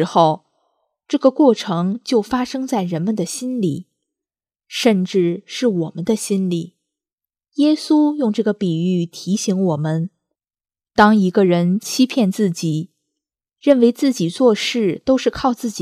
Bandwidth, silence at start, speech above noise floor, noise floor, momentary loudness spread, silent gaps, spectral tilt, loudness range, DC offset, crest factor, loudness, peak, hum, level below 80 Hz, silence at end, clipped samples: 15 kHz; 0 s; over 73 dB; under -90 dBFS; 9 LU; 7.13-7.18 s; -6 dB/octave; 3 LU; under 0.1%; 18 dB; -18 LUFS; 0 dBFS; none; -54 dBFS; 0 s; under 0.1%